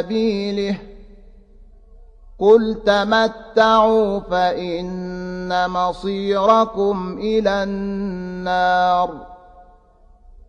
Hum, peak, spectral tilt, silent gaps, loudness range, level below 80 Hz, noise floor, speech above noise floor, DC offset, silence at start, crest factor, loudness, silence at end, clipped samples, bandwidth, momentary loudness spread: none; -2 dBFS; -6 dB/octave; none; 4 LU; -44 dBFS; -50 dBFS; 32 dB; under 0.1%; 0 s; 18 dB; -18 LUFS; 0.05 s; under 0.1%; 9.6 kHz; 12 LU